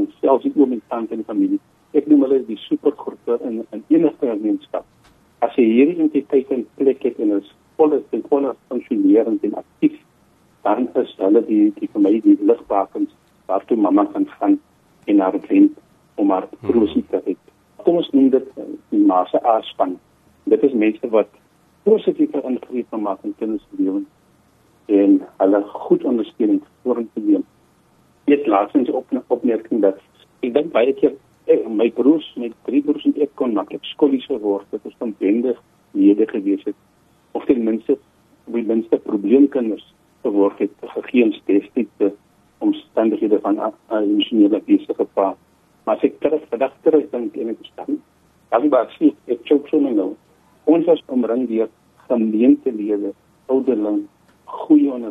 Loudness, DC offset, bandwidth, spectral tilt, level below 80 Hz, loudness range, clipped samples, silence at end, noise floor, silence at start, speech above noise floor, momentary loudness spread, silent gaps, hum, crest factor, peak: -19 LUFS; under 0.1%; 3.9 kHz; -8 dB/octave; -64 dBFS; 3 LU; under 0.1%; 0 s; -56 dBFS; 0 s; 38 dB; 12 LU; none; none; 16 dB; -2 dBFS